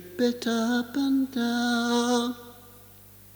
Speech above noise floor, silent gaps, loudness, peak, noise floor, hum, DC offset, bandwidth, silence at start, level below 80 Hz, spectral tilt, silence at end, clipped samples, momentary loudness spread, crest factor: 25 dB; none; -26 LUFS; -12 dBFS; -50 dBFS; 50 Hz at -55 dBFS; under 0.1%; over 20 kHz; 0 s; -64 dBFS; -3.5 dB/octave; 0.6 s; under 0.1%; 7 LU; 16 dB